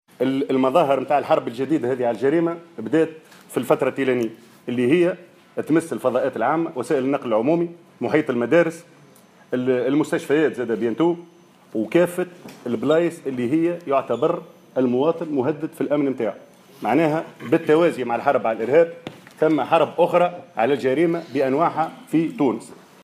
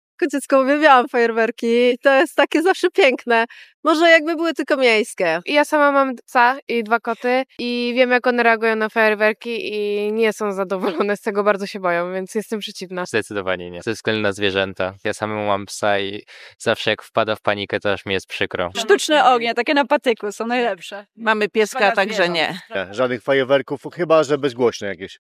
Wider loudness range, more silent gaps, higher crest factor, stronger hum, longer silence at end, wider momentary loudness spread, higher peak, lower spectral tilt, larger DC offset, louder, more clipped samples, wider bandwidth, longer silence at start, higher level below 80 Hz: second, 3 LU vs 6 LU; second, none vs 3.74-3.83 s, 6.62-6.67 s; about the same, 18 dB vs 18 dB; neither; first, 0.3 s vs 0.15 s; about the same, 11 LU vs 10 LU; about the same, -4 dBFS vs -2 dBFS; first, -6.5 dB/octave vs -4 dB/octave; neither; second, -21 LUFS vs -18 LUFS; neither; about the same, 15 kHz vs 14.5 kHz; about the same, 0.2 s vs 0.2 s; about the same, -72 dBFS vs -70 dBFS